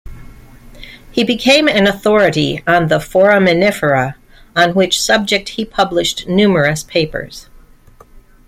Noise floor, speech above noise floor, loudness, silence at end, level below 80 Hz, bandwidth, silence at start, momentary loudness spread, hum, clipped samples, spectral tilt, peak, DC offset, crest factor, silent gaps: -43 dBFS; 30 dB; -13 LUFS; 0.3 s; -40 dBFS; 16 kHz; 0.05 s; 10 LU; none; under 0.1%; -4.5 dB/octave; 0 dBFS; under 0.1%; 14 dB; none